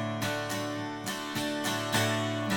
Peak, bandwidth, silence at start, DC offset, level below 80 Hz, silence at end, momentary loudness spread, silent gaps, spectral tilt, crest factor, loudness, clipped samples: -14 dBFS; 17 kHz; 0 s; under 0.1%; -66 dBFS; 0 s; 7 LU; none; -4 dB/octave; 18 dB; -31 LUFS; under 0.1%